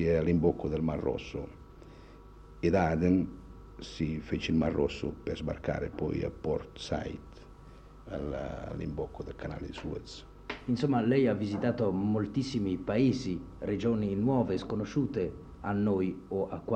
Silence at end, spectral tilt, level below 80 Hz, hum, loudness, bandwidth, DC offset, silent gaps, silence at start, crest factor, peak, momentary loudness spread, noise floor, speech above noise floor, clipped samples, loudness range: 0 s; -7.5 dB/octave; -50 dBFS; none; -32 LUFS; 9 kHz; under 0.1%; none; 0 s; 18 dB; -14 dBFS; 15 LU; -51 dBFS; 20 dB; under 0.1%; 8 LU